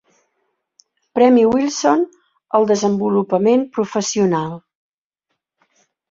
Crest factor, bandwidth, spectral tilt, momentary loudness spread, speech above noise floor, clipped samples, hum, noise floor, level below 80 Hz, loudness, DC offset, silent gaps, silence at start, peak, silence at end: 16 dB; 7.8 kHz; -5.5 dB/octave; 11 LU; 61 dB; under 0.1%; none; -76 dBFS; -60 dBFS; -17 LUFS; under 0.1%; none; 1.15 s; -2 dBFS; 1.5 s